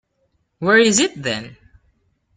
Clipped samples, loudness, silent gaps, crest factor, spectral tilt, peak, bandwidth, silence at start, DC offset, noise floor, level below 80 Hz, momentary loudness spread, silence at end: under 0.1%; -17 LUFS; none; 18 dB; -3 dB/octave; -2 dBFS; 9.6 kHz; 0.6 s; under 0.1%; -67 dBFS; -56 dBFS; 12 LU; 0.85 s